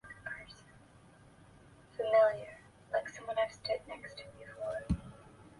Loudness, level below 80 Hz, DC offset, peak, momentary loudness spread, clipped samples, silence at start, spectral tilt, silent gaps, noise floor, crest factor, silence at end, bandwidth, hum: -35 LUFS; -54 dBFS; under 0.1%; -16 dBFS; 25 LU; under 0.1%; 0.05 s; -5.5 dB/octave; none; -60 dBFS; 20 dB; 0.1 s; 11.5 kHz; none